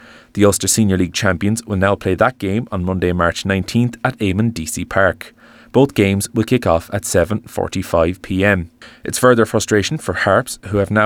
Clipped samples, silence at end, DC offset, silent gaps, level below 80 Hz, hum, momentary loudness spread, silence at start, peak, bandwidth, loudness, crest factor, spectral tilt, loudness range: under 0.1%; 0 s; under 0.1%; none; -44 dBFS; none; 7 LU; 0.35 s; 0 dBFS; 20 kHz; -17 LUFS; 16 dB; -5 dB/octave; 2 LU